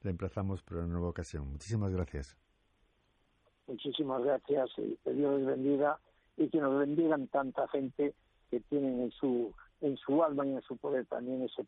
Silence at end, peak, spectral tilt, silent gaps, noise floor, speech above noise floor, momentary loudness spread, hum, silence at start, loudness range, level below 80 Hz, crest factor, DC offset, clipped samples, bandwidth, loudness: 0.05 s; -18 dBFS; -7.5 dB/octave; none; -73 dBFS; 40 dB; 11 LU; none; 0.05 s; 7 LU; -56 dBFS; 16 dB; under 0.1%; under 0.1%; 9.6 kHz; -34 LUFS